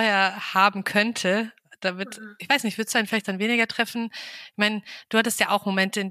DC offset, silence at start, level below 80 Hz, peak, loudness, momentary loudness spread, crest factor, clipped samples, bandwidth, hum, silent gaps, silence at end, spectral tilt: under 0.1%; 0 s; -76 dBFS; -4 dBFS; -23 LUFS; 13 LU; 20 dB; under 0.1%; 15.5 kHz; none; none; 0 s; -3.5 dB/octave